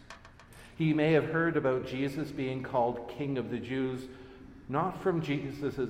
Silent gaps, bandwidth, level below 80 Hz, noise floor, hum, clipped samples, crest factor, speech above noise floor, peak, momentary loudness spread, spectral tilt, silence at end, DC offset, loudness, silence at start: none; 15 kHz; -58 dBFS; -53 dBFS; none; under 0.1%; 18 dB; 22 dB; -14 dBFS; 22 LU; -7.5 dB/octave; 0 s; under 0.1%; -32 LUFS; 0 s